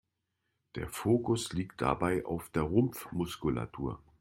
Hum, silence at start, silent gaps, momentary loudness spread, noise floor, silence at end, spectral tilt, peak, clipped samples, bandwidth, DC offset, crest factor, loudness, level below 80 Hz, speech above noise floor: none; 0.75 s; none; 10 LU; -83 dBFS; 0.25 s; -6 dB/octave; -12 dBFS; under 0.1%; 16.5 kHz; under 0.1%; 20 dB; -33 LUFS; -54 dBFS; 51 dB